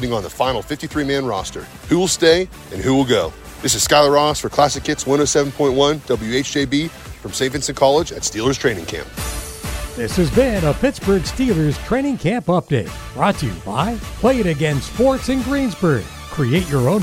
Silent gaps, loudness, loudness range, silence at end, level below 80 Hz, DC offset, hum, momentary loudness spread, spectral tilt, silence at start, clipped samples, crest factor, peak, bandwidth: none; -18 LUFS; 3 LU; 0 s; -34 dBFS; under 0.1%; none; 11 LU; -4.5 dB/octave; 0 s; under 0.1%; 18 dB; 0 dBFS; 16.5 kHz